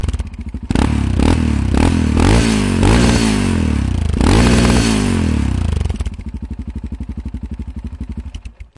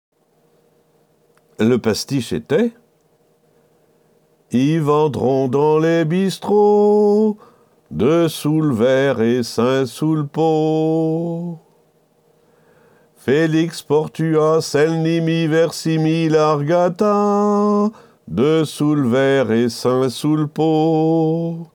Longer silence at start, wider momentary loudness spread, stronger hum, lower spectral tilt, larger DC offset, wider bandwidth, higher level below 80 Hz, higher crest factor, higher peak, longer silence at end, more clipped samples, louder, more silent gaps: second, 0 s vs 1.6 s; first, 16 LU vs 5 LU; neither; about the same, -6 dB/octave vs -6.5 dB/octave; neither; second, 11.5 kHz vs 19 kHz; first, -20 dBFS vs -58 dBFS; about the same, 12 dB vs 14 dB; about the same, -2 dBFS vs -4 dBFS; about the same, 0.15 s vs 0.1 s; neither; about the same, -15 LUFS vs -17 LUFS; neither